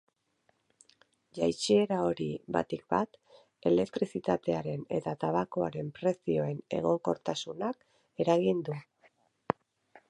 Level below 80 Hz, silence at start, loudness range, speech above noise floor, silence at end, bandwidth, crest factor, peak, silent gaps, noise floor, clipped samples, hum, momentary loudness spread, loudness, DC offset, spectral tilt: -66 dBFS; 1.35 s; 2 LU; 44 dB; 0.55 s; 11.5 kHz; 24 dB; -8 dBFS; none; -74 dBFS; under 0.1%; none; 10 LU; -32 LUFS; under 0.1%; -6 dB/octave